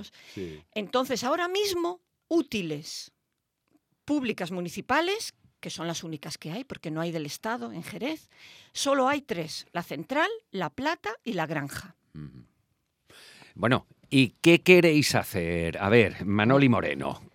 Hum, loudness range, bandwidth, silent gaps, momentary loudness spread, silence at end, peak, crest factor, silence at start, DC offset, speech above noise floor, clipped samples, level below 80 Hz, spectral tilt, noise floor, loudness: none; 11 LU; 17 kHz; none; 18 LU; 0.1 s; -2 dBFS; 26 dB; 0 s; under 0.1%; 53 dB; under 0.1%; -62 dBFS; -5 dB/octave; -80 dBFS; -27 LUFS